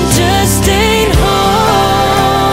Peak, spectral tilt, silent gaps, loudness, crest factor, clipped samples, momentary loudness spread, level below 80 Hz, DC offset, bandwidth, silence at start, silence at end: 0 dBFS; -4 dB/octave; none; -10 LUFS; 10 dB; under 0.1%; 1 LU; -20 dBFS; under 0.1%; 16.5 kHz; 0 s; 0 s